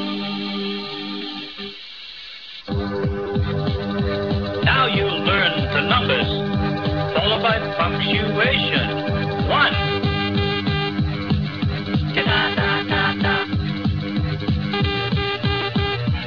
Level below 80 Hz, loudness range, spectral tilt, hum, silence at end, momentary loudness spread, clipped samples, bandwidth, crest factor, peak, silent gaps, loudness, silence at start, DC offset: -36 dBFS; 6 LU; -7.5 dB/octave; none; 0 s; 10 LU; under 0.1%; 5.4 kHz; 16 dB; -4 dBFS; none; -20 LUFS; 0 s; 0.4%